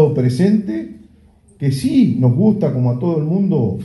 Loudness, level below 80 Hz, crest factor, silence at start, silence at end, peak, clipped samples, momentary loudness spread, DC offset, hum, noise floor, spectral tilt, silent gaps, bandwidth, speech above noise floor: -16 LUFS; -50 dBFS; 14 dB; 0 s; 0 s; -2 dBFS; under 0.1%; 9 LU; under 0.1%; none; -49 dBFS; -9 dB/octave; none; 11.5 kHz; 34 dB